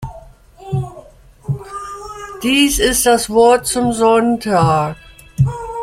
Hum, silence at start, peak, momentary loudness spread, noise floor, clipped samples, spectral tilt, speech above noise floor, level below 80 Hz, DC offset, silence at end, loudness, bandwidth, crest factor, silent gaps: none; 0 s; -2 dBFS; 18 LU; -41 dBFS; under 0.1%; -4.5 dB/octave; 28 dB; -36 dBFS; under 0.1%; 0 s; -15 LUFS; 16.5 kHz; 14 dB; none